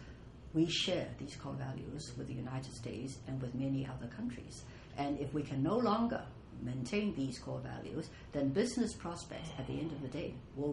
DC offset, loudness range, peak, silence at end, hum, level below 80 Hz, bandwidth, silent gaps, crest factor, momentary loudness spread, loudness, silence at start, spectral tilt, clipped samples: under 0.1%; 5 LU; -20 dBFS; 0 s; none; -58 dBFS; 11 kHz; none; 18 dB; 12 LU; -39 LUFS; 0 s; -5.5 dB/octave; under 0.1%